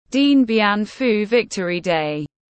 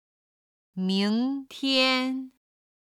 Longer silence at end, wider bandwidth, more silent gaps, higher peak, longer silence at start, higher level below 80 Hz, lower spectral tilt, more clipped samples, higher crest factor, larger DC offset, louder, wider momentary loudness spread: second, 0.35 s vs 0.7 s; second, 8.6 kHz vs 14 kHz; neither; first, -4 dBFS vs -10 dBFS; second, 0.1 s vs 0.75 s; first, -58 dBFS vs -78 dBFS; about the same, -5 dB/octave vs -5 dB/octave; neither; about the same, 14 dB vs 18 dB; neither; first, -18 LUFS vs -26 LUFS; second, 8 LU vs 16 LU